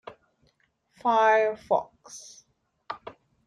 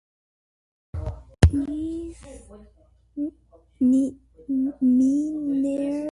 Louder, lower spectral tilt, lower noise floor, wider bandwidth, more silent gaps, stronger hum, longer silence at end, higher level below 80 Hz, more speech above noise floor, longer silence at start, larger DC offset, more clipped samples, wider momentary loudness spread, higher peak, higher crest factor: about the same, -24 LUFS vs -24 LUFS; second, -3.5 dB/octave vs -8 dB/octave; first, -69 dBFS vs -57 dBFS; about the same, 10.5 kHz vs 11.5 kHz; neither; neither; first, 0.35 s vs 0 s; second, -72 dBFS vs -34 dBFS; first, 45 dB vs 35 dB; about the same, 1.05 s vs 0.95 s; neither; neither; first, 26 LU vs 18 LU; second, -10 dBFS vs -2 dBFS; about the same, 20 dB vs 22 dB